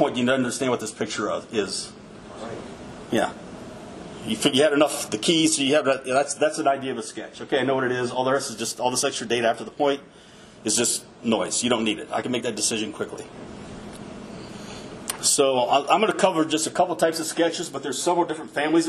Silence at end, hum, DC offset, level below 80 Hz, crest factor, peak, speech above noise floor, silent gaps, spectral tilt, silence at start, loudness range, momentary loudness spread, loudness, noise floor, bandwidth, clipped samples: 0 s; none; under 0.1%; -58 dBFS; 20 dB; -4 dBFS; 24 dB; none; -3 dB/octave; 0 s; 7 LU; 19 LU; -23 LUFS; -47 dBFS; 13 kHz; under 0.1%